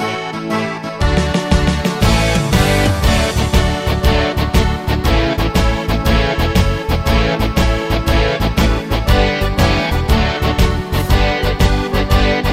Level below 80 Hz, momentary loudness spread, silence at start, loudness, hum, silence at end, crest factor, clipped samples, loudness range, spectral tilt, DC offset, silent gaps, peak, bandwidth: -18 dBFS; 3 LU; 0 s; -15 LUFS; none; 0 s; 12 dB; under 0.1%; 1 LU; -5.5 dB/octave; under 0.1%; none; 0 dBFS; 16.5 kHz